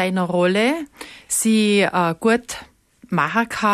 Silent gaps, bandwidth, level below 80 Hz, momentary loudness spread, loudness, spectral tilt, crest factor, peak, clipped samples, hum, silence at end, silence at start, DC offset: none; 14 kHz; -56 dBFS; 16 LU; -19 LUFS; -4 dB/octave; 14 dB; -6 dBFS; under 0.1%; none; 0 s; 0 s; under 0.1%